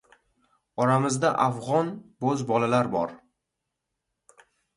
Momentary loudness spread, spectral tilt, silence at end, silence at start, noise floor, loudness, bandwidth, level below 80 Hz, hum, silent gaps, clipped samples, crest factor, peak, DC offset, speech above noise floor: 9 LU; -6 dB/octave; 1.6 s; 0.75 s; -83 dBFS; -25 LUFS; 11.5 kHz; -66 dBFS; none; none; under 0.1%; 20 dB; -8 dBFS; under 0.1%; 59 dB